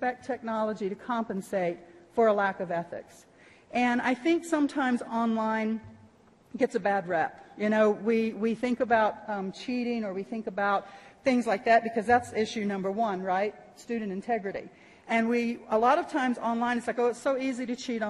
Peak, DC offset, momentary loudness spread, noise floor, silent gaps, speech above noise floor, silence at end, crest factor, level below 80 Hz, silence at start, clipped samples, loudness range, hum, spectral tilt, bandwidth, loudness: -12 dBFS; under 0.1%; 10 LU; -58 dBFS; none; 30 dB; 0 s; 18 dB; -68 dBFS; 0 s; under 0.1%; 3 LU; none; -5.5 dB/octave; 12 kHz; -28 LUFS